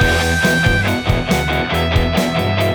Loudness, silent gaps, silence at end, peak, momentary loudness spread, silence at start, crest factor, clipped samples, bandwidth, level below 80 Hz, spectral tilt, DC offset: -16 LUFS; none; 0 s; -2 dBFS; 3 LU; 0 s; 14 dB; under 0.1%; over 20 kHz; -26 dBFS; -5 dB/octave; under 0.1%